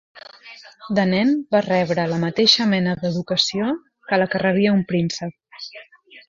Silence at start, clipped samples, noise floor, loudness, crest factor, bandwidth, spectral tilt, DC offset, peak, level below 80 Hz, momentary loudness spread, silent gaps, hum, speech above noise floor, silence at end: 0.15 s; under 0.1%; -44 dBFS; -19 LUFS; 20 dB; 7.6 kHz; -5 dB/octave; under 0.1%; -2 dBFS; -60 dBFS; 20 LU; none; none; 24 dB; 0.1 s